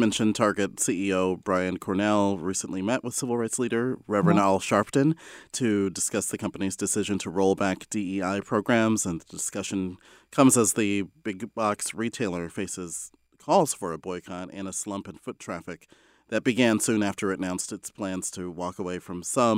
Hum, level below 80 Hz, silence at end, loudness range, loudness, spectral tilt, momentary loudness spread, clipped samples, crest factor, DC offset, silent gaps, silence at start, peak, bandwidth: none; -64 dBFS; 0 s; 5 LU; -26 LUFS; -4.5 dB/octave; 13 LU; under 0.1%; 22 dB; under 0.1%; none; 0 s; -6 dBFS; 16 kHz